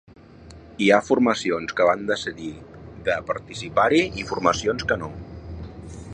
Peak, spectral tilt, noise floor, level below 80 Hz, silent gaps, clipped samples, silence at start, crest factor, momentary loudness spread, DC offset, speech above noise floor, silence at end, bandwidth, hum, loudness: -2 dBFS; -5 dB/octave; -45 dBFS; -46 dBFS; none; under 0.1%; 0.4 s; 22 dB; 19 LU; under 0.1%; 23 dB; 0 s; 10.5 kHz; none; -22 LUFS